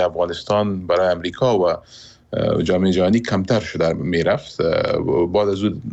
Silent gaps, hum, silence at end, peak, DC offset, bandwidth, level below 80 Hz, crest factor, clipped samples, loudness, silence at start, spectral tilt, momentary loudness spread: none; none; 0 s; -8 dBFS; under 0.1%; 8.2 kHz; -46 dBFS; 12 dB; under 0.1%; -19 LUFS; 0 s; -6.5 dB/octave; 4 LU